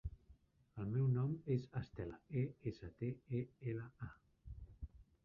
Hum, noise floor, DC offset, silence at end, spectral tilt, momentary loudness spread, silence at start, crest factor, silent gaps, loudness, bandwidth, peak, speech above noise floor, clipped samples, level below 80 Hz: none; -69 dBFS; under 0.1%; 0.25 s; -9.5 dB/octave; 19 LU; 0.05 s; 18 dB; none; -43 LUFS; 5.8 kHz; -26 dBFS; 27 dB; under 0.1%; -60 dBFS